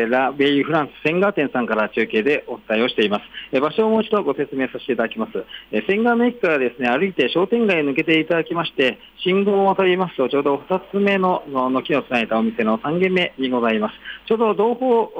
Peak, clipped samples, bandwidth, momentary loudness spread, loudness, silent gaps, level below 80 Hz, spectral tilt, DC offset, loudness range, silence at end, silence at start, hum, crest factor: -6 dBFS; under 0.1%; 8.4 kHz; 6 LU; -19 LUFS; none; -60 dBFS; -7 dB/octave; under 0.1%; 2 LU; 0 s; 0 s; none; 12 dB